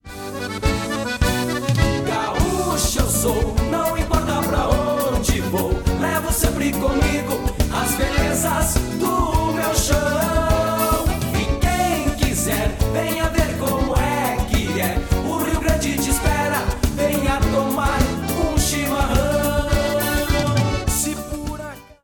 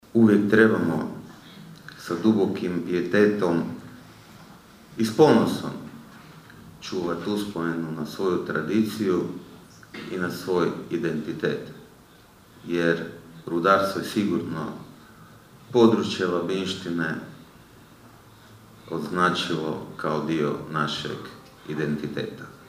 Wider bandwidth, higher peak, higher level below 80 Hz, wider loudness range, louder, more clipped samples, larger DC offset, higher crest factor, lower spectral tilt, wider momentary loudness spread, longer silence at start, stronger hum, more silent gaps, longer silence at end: first, 18 kHz vs 15.5 kHz; about the same, -4 dBFS vs -4 dBFS; first, -26 dBFS vs -62 dBFS; second, 1 LU vs 5 LU; first, -20 LUFS vs -25 LUFS; neither; neither; second, 16 dB vs 22 dB; second, -4.5 dB/octave vs -6 dB/octave; second, 3 LU vs 22 LU; about the same, 0.05 s vs 0.15 s; neither; neither; about the same, 0.1 s vs 0.05 s